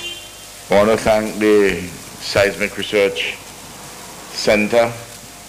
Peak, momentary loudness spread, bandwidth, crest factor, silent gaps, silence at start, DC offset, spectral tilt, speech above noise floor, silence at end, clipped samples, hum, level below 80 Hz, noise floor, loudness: -4 dBFS; 19 LU; 16 kHz; 14 dB; none; 0 s; under 0.1%; -4 dB/octave; 20 dB; 0 s; under 0.1%; none; -44 dBFS; -36 dBFS; -17 LUFS